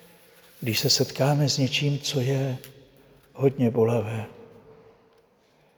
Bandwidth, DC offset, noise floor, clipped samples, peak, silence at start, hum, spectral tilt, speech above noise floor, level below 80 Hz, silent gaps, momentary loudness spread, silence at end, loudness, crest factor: over 20 kHz; under 0.1%; -62 dBFS; under 0.1%; -8 dBFS; 0.6 s; none; -5 dB/octave; 38 dB; -66 dBFS; none; 12 LU; 1.05 s; -24 LUFS; 18 dB